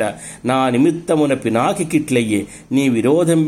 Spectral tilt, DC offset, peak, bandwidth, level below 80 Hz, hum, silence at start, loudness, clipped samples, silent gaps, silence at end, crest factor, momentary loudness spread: -6 dB/octave; under 0.1%; -2 dBFS; 15.5 kHz; -54 dBFS; none; 0 s; -17 LUFS; under 0.1%; none; 0 s; 14 dB; 6 LU